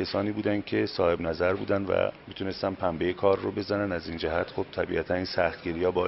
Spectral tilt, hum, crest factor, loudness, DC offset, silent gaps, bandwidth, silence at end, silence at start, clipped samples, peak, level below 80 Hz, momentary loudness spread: -4.5 dB/octave; none; 18 dB; -28 LUFS; under 0.1%; none; 6 kHz; 0 s; 0 s; under 0.1%; -10 dBFS; -54 dBFS; 5 LU